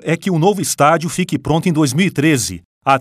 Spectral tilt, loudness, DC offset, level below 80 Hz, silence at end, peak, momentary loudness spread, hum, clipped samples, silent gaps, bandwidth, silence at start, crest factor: -5 dB/octave; -15 LUFS; under 0.1%; -46 dBFS; 0 s; 0 dBFS; 6 LU; none; under 0.1%; 2.65-2.81 s; 16 kHz; 0.05 s; 16 dB